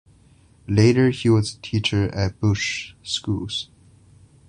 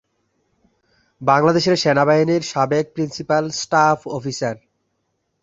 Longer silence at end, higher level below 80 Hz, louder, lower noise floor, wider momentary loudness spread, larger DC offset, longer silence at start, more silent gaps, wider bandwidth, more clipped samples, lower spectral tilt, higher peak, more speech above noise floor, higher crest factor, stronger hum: about the same, 0.85 s vs 0.85 s; first, -44 dBFS vs -58 dBFS; second, -21 LUFS vs -18 LUFS; second, -54 dBFS vs -71 dBFS; about the same, 11 LU vs 11 LU; neither; second, 0.7 s vs 1.2 s; neither; first, 10.5 kHz vs 8 kHz; neither; about the same, -5.5 dB/octave vs -5 dB/octave; about the same, -2 dBFS vs -2 dBFS; second, 33 dB vs 54 dB; about the same, 20 dB vs 18 dB; neither